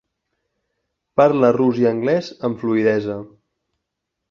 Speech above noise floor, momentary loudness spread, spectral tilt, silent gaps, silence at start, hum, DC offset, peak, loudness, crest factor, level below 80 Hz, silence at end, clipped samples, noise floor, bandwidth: 62 dB; 11 LU; -8 dB/octave; none; 1.15 s; none; under 0.1%; 0 dBFS; -18 LUFS; 20 dB; -60 dBFS; 1.05 s; under 0.1%; -79 dBFS; 7 kHz